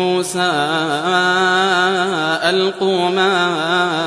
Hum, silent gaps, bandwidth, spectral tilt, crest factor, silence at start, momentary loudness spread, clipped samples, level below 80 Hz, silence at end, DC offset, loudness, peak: none; none; 11 kHz; -3.5 dB/octave; 14 dB; 0 s; 3 LU; under 0.1%; -62 dBFS; 0 s; under 0.1%; -15 LUFS; -2 dBFS